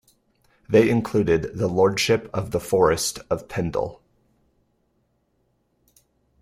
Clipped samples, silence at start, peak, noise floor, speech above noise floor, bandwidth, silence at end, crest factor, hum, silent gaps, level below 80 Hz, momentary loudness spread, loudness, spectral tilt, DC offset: under 0.1%; 0.7 s; -4 dBFS; -69 dBFS; 48 dB; 15.5 kHz; 2.45 s; 20 dB; none; none; -50 dBFS; 9 LU; -22 LUFS; -5 dB/octave; under 0.1%